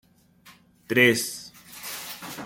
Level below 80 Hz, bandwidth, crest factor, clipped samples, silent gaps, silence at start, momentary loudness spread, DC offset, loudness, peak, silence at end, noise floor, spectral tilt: -68 dBFS; 17 kHz; 24 dB; under 0.1%; none; 0.45 s; 20 LU; under 0.1%; -23 LUFS; -4 dBFS; 0 s; -55 dBFS; -3.5 dB/octave